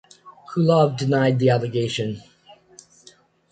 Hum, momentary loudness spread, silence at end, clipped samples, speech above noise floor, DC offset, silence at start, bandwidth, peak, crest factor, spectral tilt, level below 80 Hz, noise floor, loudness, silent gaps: none; 12 LU; 1.3 s; under 0.1%; 34 dB; under 0.1%; 0.25 s; 9.2 kHz; -4 dBFS; 18 dB; -7 dB/octave; -60 dBFS; -53 dBFS; -20 LUFS; none